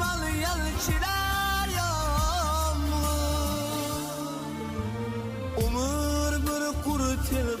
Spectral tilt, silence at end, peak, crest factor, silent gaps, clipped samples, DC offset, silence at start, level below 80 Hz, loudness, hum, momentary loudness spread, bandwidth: -4.5 dB/octave; 0 s; -14 dBFS; 12 dB; none; under 0.1%; under 0.1%; 0 s; -32 dBFS; -28 LUFS; none; 7 LU; 16 kHz